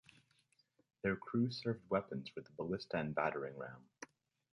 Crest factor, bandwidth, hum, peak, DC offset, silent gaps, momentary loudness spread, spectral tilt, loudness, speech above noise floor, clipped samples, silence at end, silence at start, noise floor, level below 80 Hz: 20 dB; 11 kHz; none; -22 dBFS; under 0.1%; none; 16 LU; -7 dB/octave; -41 LUFS; 37 dB; under 0.1%; 0.5 s; 1.05 s; -77 dBFS; -72 dBFS